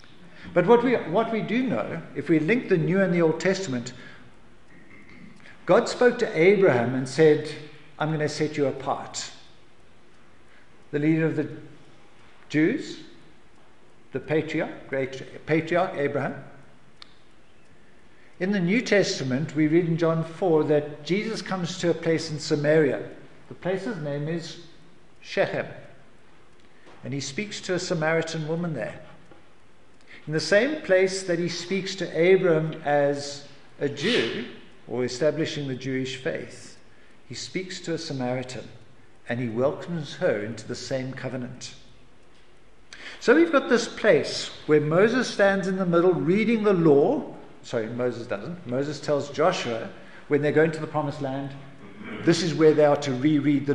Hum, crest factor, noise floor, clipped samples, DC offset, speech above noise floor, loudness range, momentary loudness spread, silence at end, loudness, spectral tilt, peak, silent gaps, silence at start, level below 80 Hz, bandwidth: none; 20 dB; -57 dBFS; under 0.1%; 0.5%; 33 dB; 9 LU; 16 LU; 0 s; -24 LUFS; -5.5 dB/octave; -6 dBFS; none; 0.25 s; -64 dBFS; 11 kHz